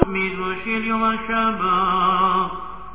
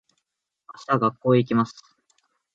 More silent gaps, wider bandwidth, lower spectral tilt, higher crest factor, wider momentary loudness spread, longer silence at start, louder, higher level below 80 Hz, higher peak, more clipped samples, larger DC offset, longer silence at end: neither; second, 4 kHz vs 7.8 kHz; about the same, -9 dB/octave vs -8 dB/octave; about the same, 20 dB vs 18 dB; about the same, 7 LU vs 9 LU; second, 0 s vs 0.75 s; first, -20 LUFS vs -23 LUFS; first, -40 dBFS vs -68 dBFS; first, 0 dBFS vs -6 dBFS; neither; first, 1% vs under 0.1%; second, 0 s vs 0.85 s